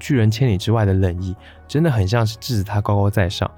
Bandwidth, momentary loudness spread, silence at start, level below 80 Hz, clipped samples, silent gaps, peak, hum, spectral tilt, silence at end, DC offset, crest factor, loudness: 16.5 kHz; 8 LU; 0 s; -46 dBFS; under 0.1%; none; -4 dBFS; none; -7 dB/octave; 0.1 s; under 0.1%; 14 dB; -19 LUFS